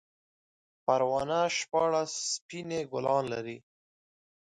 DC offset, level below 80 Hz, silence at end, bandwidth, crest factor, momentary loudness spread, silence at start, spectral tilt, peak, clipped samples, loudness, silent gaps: under 0.1%; -70 dBFS; 0.8 s; 11 kHz; 20 dB; 9 LU; 0.9 s; -3.5 dB/octave; -12 dBFS; under 0.1%; -30 LUFS; 2.41-2.49 s